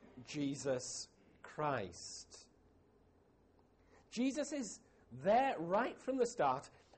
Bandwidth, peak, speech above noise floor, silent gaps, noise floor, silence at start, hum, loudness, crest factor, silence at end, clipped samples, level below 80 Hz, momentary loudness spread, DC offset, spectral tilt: 8.4 kHz; -24 dBFS; 32 dB; none; -70 dBFS; 0.05 s; none; -39 LUFS; 18 dB; 0.3 s; under 0.1%; -74 dBFS; 19 LU; under 0.1%; -4.5 dB/octave